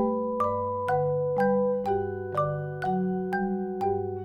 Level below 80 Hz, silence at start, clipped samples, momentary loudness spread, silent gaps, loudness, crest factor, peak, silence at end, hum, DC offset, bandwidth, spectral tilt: -56 dBFS; 0 s; under 0.1%; 5 LU; none; -28 LUFS; 12 dB; -14 dBFS; 0 s; 50 Hz at -55 dBFS; under 0.1%; 9.8 kHz; -9 dB/octave